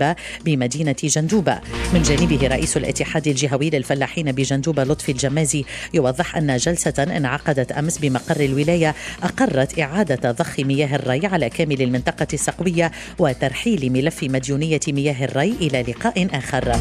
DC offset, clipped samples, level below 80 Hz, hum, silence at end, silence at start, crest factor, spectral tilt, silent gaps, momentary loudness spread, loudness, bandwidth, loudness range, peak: under 0.1%; under 0.1%; -36 dBFS; none; 0 s; 0 s; 16 dB; -5 dB/octave; none; 4 LU; -20 LUFS; 14 kHz; 1 LU; -2 dBFS